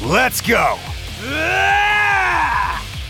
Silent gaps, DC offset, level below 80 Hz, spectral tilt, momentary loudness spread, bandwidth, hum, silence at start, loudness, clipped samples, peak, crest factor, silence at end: none; under 0.1%; -34 dBFS; -3.5 dB/octave; 11 LU; 18 kHz; none; 0 s; -16 LUFS; under 0.1%; -2 dBFS; 16 dB; 0 s